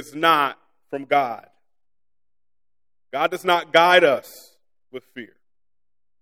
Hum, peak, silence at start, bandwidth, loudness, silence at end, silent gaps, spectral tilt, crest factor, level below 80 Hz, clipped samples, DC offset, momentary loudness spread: none; 0 dBFS; 0 s; 17 kHz; -19 LUFS; 0.95 s; none; -3.5 dB/octave; 22 dB; -74 dBFS; under 0.1%; under 0.1%; 25 LU